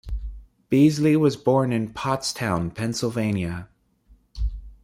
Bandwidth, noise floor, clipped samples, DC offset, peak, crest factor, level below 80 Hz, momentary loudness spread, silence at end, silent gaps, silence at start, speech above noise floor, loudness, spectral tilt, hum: 16 kHz; -57 dBFS; under 0.1%; under 0.1%; -6 dBFS; 18 dB; -38 dBFS; 14 LU; 0.1 s; none; 0.05 s; 35 dB; -23 LUFS; -6 dB/octave; none